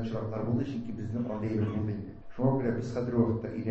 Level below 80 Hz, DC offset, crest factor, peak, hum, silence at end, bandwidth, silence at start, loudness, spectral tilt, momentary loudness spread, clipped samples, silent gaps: -52 dBFS; under 0.1%; 18 dB; -14 dBFS; none; 0 s; 7.8 kHz; 0 s; -32 LUFS; -9.5 dB/octave; 7 LU; under 0.1%; none